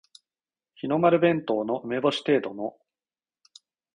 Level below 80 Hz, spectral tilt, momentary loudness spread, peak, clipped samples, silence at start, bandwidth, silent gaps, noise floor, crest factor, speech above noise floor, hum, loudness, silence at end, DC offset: -70 dBFS; -6.5 dB/octave; 15 LU; -6 dBFS; under 0.1%; 0.85 s; 10.5 kHz; none; under -90 dBFS; 22 dB; over 66 dB; none; -25 LUFS; 1.25 s; under 0.1%